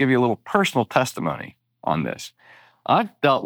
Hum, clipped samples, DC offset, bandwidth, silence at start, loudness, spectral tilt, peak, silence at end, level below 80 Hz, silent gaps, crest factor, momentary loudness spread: none; under 0.1%; under 0.1%; over 20 kHz; 0 s; -22 LUFS; -5.5 dB/octave; -4 dBFS; 0 s; -60 dBFS; none; 18 dB; 15 LU